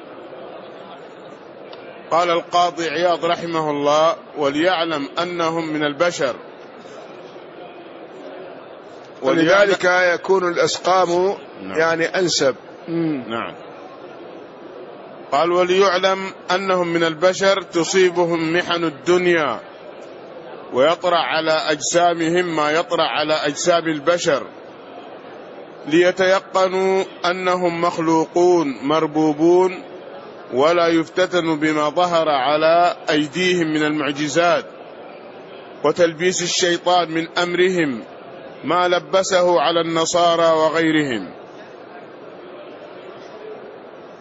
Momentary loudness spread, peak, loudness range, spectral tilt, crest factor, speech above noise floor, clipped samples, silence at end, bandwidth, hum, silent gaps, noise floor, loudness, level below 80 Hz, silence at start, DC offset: 22 LU; -4 dBFS; 5 LU; -4 dB/octave; 16 dB; 21 dB; under 0.1%; 0 s; 8 kHz; none; none; -38 dBFS; -18 LUFS; -64 dBFS; 0 s; under 0.1%